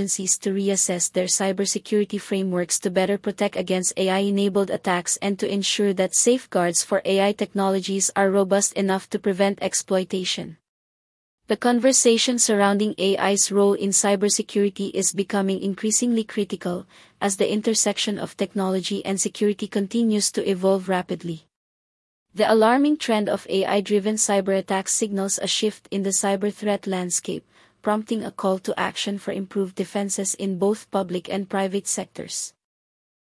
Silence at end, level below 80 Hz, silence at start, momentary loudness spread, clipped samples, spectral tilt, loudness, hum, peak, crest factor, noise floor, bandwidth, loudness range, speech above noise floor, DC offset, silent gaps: 0.85 s; -68 dBFS; 0 s; 9 LU; under 0.1%; -3.5 dB/octave; -22 LUFS; none; -6 dBFS; 16 dB; under -90 dBFS; 12 kHz; 5 LU; over 68 dB; under 0.1%; 10.69-11.38 s, 21.56-22.26 s